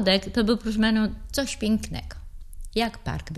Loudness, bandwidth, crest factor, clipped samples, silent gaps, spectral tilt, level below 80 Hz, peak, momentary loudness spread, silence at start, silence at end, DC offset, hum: -25 LUFS; 13 kHz; 20 dB; under 0.1%; none; -4.5 dB/octave; -38 dBFS; -6 dBFS; 15 LU; 0 s; 0 s; under 0.1%; none